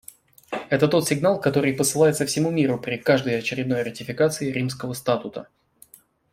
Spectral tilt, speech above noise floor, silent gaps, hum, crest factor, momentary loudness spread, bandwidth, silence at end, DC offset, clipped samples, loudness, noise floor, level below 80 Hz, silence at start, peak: -5 dB/octave; 31 dB; none; none; 18 dB; 9 LU; 16 kHz; 0.9 s; under 0.1%; under 0.1%; -22 LUFS; -53 dBFS; -60 dBFS; 0.5 s; -6 dBFS